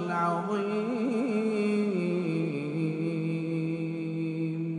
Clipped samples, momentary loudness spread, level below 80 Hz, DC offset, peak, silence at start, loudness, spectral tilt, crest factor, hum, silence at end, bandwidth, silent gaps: under 0.1%; 4 LU; -76 dBFS; under 0.1%; -16 dBFS; 0 s; -30 LUFS; -8 dB/octave; 14 dB; none; 0 s; 10.5 kHz; none